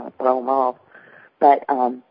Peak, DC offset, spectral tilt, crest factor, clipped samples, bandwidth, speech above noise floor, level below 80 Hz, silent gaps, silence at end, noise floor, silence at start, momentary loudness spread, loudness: -2 dBFS; under 0.1%; -10 dB/octave; 18 dB; under 0.1%; 5.2 kHz; 30 dB; -70 dBFS; none; 0.1 s; -48 dBFS; 0 s; 6 LU; -19 LUFS